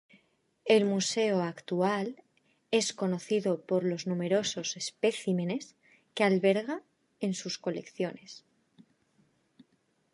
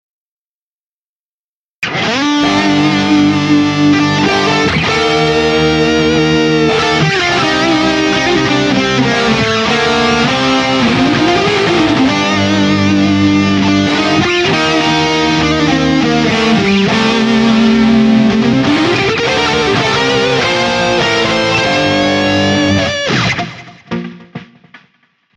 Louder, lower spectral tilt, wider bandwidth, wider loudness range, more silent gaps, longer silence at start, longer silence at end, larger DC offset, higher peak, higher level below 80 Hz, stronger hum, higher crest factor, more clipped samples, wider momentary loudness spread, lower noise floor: second, -30 LUFS vs -11 LUFS; about the same, -4.5 dB/octave vs -5 dB/octave; first, 11.5 kHz vs 10 kHz; first, 5 LU vs 2 LU; neither; second, 0.65 s vs 1.8 s; first, 1.75 s vs 0.6 s; neither; second, -10 dBFS vs 0 dBFS; second, -80 dBFS vs -38 dBFS; neither; first, 22 dB vs 10 dB; neither; first, 13 LU vs 2 LU; second, -73 dBFS vs under -90 dBFS